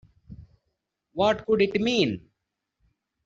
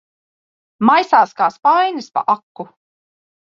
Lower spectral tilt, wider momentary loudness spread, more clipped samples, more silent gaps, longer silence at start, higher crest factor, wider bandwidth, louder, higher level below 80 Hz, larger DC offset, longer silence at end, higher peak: about the same, -5.5 dB/octave vs -5 dB/octave; second, 12 LU vs 20 LU; neither; second, none vs 2.43-2.55 s; second, 0.3 s vs 0.8 s; about the same, 20 dB vs 16 dB; about the same, 7.8 kHz vs 7.4 kHz; second, -24 LUFS vs -15 LUFS; first, -58 dBFS vs -70 dBFS; neither; about the same, 1.05 s vs 0.95 s; second, -8 dBFS vs -2 dBFS